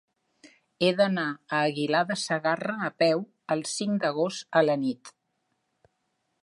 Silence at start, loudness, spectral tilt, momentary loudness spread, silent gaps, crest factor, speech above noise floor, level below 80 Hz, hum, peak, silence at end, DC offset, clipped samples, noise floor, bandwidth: 0.8 s; -27 LUFS; -4.5 dB/octave; 7 LU; none; 20 dB; 51 dB; -76 dBFS; none; -8 dBFS; 1.3 s; under 0.1%; under 0.1%; -77 dBFS; 11.5 kHz